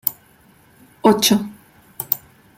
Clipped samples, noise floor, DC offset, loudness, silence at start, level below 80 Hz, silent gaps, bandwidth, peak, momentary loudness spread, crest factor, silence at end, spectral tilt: under 0.1%; -52 dBFS; under 0.1%; -18 LUFS; 0.05 s; -60 dBFS; none; 16.5 kHz; 0 dBFS; 15 LU; 22 dB; 0.4 s; -3.5 dB/octave